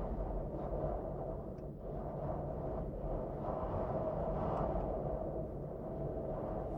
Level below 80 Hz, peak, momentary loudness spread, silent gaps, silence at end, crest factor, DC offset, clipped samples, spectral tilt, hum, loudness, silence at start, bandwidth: -46 dBFS; -24 dBFS; 6 LU; none; 0 s; 14 dB; under 0.1%; under 0.1%; -11 dB/octave; none; -41 LUFS; 0 s; 4.5 kHz